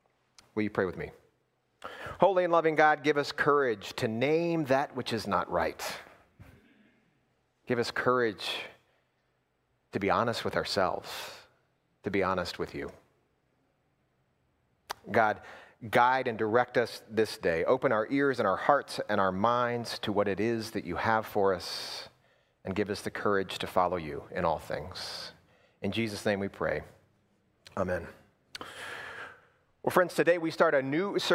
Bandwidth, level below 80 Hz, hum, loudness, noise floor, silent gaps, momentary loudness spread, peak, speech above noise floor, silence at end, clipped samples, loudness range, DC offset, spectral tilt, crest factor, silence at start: 16 kHz; -62 dBFS; none; -30 LUFS; -75 dBFS; none; 16 LU; -6 dBFS; 46 dB; 0 s; under 0.1%; 8 LU; under 0.1%; -5 dB/octave; 24 dB; 0.55 s